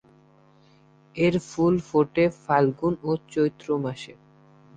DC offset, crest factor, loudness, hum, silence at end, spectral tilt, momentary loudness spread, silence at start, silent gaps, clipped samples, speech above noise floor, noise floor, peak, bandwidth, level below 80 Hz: under 0.1%; 20 dB; -24 LUFS; none; 0.65 s; -7 dB/octave; 10 LU; 1.15 s; none; under 0.1%; 33 dB; -57 dBFS; -6 dBFS; 9.2 kHz; -56 dBFS